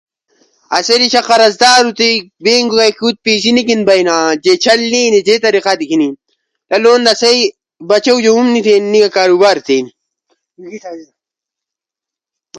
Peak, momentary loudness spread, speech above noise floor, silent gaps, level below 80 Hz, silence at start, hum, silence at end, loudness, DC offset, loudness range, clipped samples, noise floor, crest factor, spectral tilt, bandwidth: 0 dBFS; 8 LU; 75 dB; none; -58 dBFS; 0.7 s; none; 0 s; -10 LUFS; under 0.1%; 4 LU; under 0.1%; -85 dBFS; 12 dB; -2.5 dB/octave; 11.5 kHz